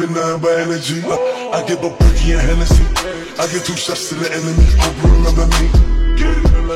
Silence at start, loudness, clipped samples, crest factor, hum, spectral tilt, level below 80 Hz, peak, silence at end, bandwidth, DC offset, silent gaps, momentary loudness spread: 0 s; -15 LUFS; under 0.1%; 12 dB; none; -5 dB/octave; -14 dBFS; 0 dBFS; 0 s; 13.5 kHz; under 0.1%; none; 6 LU